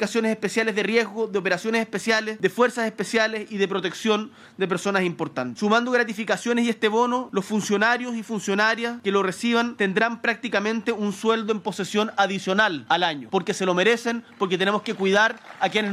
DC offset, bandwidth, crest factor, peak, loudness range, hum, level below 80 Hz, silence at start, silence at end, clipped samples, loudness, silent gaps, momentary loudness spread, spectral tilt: under 0.1%; 14.5 kHz; 18 dB; -6 dBFS; 2 LU; none; -72 dBFS; 0 s; 0 s; under 0.1%; -23 LUFS; none; 6 LU; -4 dB/octave